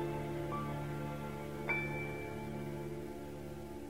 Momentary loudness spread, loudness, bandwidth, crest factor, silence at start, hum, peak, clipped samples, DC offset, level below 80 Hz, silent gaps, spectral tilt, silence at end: 10 LU; -41 LUFS; 16 kHz; 18 dB; 0 s; none; -24 dBFS; under 0.1%; 0.2%; -56 dBFS; none; -6.5 dB/octave; 0 s